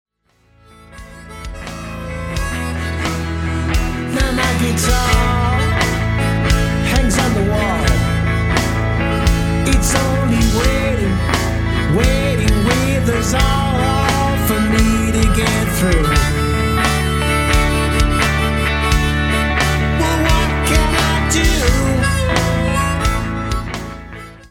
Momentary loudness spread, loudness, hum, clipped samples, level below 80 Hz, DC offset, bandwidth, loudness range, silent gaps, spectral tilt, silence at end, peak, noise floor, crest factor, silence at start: 7 LU; -16 LUFS; none; under 0.1%; -20 dBFS; under 0.1%; 17.5 kHz; 3 LU; none; -5 dB/octave; 0.05 s; -2 dBFS; -56 dBFS; 14 dB; 0.95 s